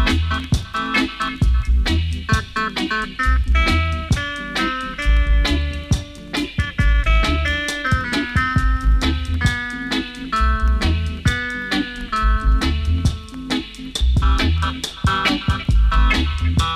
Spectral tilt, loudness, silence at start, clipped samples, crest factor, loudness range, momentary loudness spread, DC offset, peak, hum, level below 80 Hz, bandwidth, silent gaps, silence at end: -5 dB/octave; -20 LUFS; 0 s; under 0.1%; 14 dB; 1 LU; 6 LU; under 0.1%; -4 dBFS; none; -20 dBFS; 12 kHz; none; 0 s